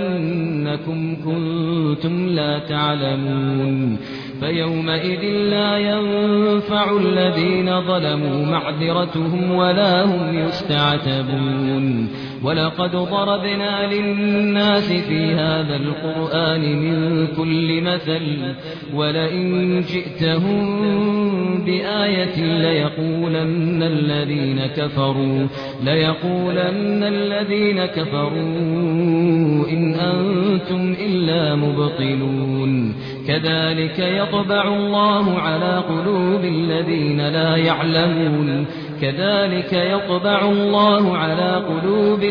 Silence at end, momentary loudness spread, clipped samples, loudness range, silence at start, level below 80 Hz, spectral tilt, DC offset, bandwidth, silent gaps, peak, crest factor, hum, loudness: 0 s; 5 LU; under 0.1%; 2 LU; 0 s; -52 dBFS; -8.5 dB/octave; under 0.1%; 5.4 kHz; none; -4 dBFS; 14 dB; none; -19 LUFS